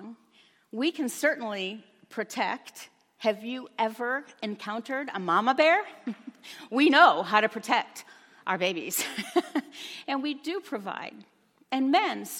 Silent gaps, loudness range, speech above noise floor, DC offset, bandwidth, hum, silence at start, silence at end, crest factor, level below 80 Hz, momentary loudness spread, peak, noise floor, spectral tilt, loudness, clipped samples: none; 8 LU; 35 dB; under 0.1%; 17 kHz; none; 0 s; 0 s; 24 dB; -86 dBFS; 19 LU; -6 dBFS; -62 dBFS; -3 dB/octave; -27 LUFS; under 0.1%